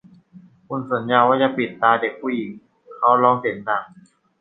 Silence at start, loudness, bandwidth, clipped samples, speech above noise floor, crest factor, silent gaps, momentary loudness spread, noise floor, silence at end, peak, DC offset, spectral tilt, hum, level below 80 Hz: 0.35 s; -19 LUFS; 4.1 kHz; under 0.1%; 29 dB; 20 dB; none; 12 LU; -48 dBFS; 0.55 s; -2 dBFS; under 0.1%; -8 dB/octave; none; -68 dBFS